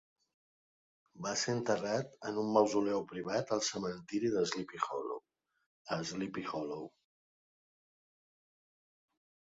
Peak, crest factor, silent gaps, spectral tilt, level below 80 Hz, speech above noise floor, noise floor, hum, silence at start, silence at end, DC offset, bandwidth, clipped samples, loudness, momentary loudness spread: -14 dBFS; 24 dB; 5.66-5.85 s; -4 dB/octave; -76 dBFS; 25 dB; -60 dBFS; none; 1.15 s; 2.7 s; under 0.1%; 7.6 kHz; under 0.1%; -36 LUFS; 11 LU